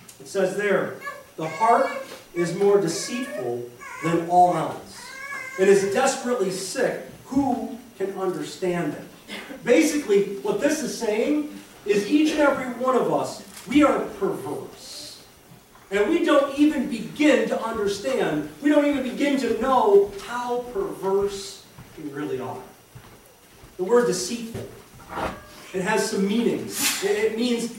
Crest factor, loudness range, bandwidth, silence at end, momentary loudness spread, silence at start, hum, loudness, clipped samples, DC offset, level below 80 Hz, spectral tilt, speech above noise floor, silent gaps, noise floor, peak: 18 dB; 6 LU; 17 kHz; 0 s; 16 LU; 0.1 s; none; -23 LUFS; under 0.1%; under 0.1%; -56 dBFS; -4.5 dB/octave; 28 dB; none; -50 dBFS; -6 dBFS